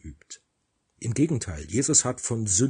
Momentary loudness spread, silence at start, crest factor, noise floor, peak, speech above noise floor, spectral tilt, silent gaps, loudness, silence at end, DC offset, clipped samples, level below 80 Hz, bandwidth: 23 LU; 0.05 s; 20 dB; -75 dBFS; -6 dBFS; 50 dB; -4 dB/octave; none; -24 LUFS; 0 s; under 0.1%; under 0.1%; -52 dBFS; 10 kHz